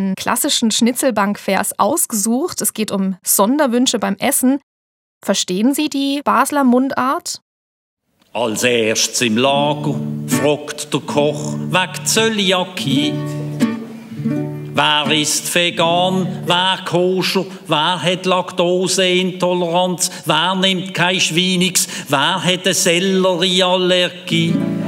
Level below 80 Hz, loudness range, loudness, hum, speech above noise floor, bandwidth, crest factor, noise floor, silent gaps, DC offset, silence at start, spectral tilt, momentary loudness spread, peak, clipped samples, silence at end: -66 dBFS; 3 LU; -16 LUFS; none; over 74 dB; 18 kHz; 16 dB; under -90 dBFS; 4.63-5.21 s, 7.42-7.97 s; under 0.1%; 0 s; -3.5 dB/octave; 7 LU; 0 dBFS; under 0.1%; 0 s